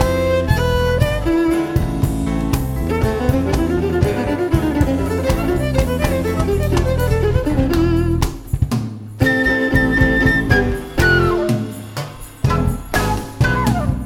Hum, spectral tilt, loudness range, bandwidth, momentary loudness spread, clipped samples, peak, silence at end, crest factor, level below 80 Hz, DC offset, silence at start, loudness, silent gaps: none; -6.5 dB/octave; 2 LU; 17.5 kHz; 6 LU; under 0.1%; 0 dBFS; 0 s; 16 dB; -24 dBFS; under 0.1%; 0 s; -17 LUFS; none